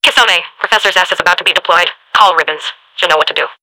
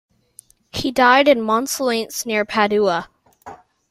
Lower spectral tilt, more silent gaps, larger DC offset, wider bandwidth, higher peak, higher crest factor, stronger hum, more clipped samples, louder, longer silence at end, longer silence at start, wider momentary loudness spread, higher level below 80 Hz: second, 0 dB/octave vs -3 dB/octave; neither; neither; first, over 20 kHz vs 16 kHz; about the same, 0 dBFS vs -2 dBFS; second, 12 dB vs 18 dB; neither; first, 2% vs under 0.1%; first, -10 LUFS vs -17 LUFS; second, 0.1 s vs 0.35 s; second, 0.05 s vs 0.75 s; second, 7 LU vs 11 LU; about the same, -52 dBFS vs -54 dBFS